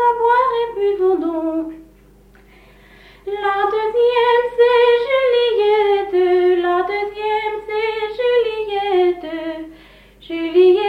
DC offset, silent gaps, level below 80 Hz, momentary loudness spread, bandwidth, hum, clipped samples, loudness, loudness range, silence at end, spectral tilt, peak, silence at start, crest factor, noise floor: under 0.1%; none; -52 dBFS; 12 LU; 5.2 kHz; none; under 0.1%; -17 LUFS; 7 LU; 0 s; -5 dB/octave; -4 dBFS; 0 s; 14 dB; -47 dBFS